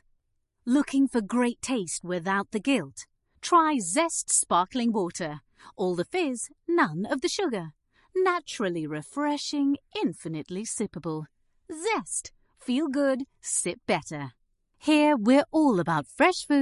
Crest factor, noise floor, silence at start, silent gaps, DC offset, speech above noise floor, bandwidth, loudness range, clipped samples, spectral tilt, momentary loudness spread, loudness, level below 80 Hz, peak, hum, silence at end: 18 dB; -74 dBFS; 0.65 s; none; under 0.1%; 48 dB; 11.5 kHz; 5 LU; under 0.1%; -4 dB/octave; 14 LU; -27 LUFS; -66 dBFS; -8 dBFS; none; 0 s